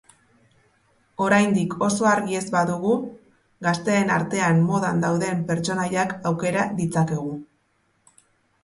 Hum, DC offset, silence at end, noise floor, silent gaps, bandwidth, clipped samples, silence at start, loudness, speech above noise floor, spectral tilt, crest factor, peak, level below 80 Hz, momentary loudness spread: none; under 0.1%; 1.2 s; -67 dBFS; none; 11.5 kHz; under 0.1%; 1.2 s; -22 LUFS; 45 dB; -6 dB/octave; 18 dB; -6 dBFS; -60 dBFS; 7 LU